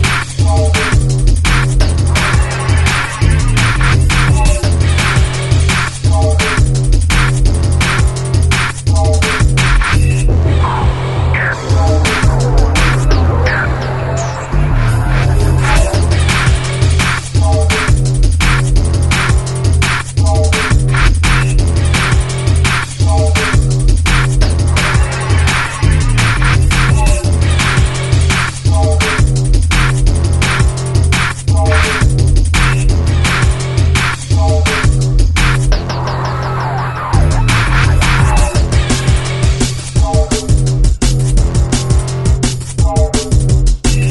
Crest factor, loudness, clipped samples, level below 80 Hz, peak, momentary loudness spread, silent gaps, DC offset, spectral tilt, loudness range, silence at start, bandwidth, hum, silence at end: 10 dB; -12 LUFS; under 0.1%; -14 dBFS; 0 dBFS; 3 LU; none; under 0.1%; -5 dB/octave; 1 LU; 0 s; 12 kHz; none; 0 s